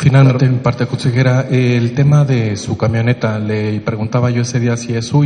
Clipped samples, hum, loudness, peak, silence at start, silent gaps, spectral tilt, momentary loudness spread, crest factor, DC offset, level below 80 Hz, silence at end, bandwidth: under 0.1%; none; -14 LUFS; 0 dBFS; 0 s; none; -7 dB/octave; 7 LU; 12 dB; under 0.1%; -46 dBFS; 0 s; 9.8 kHz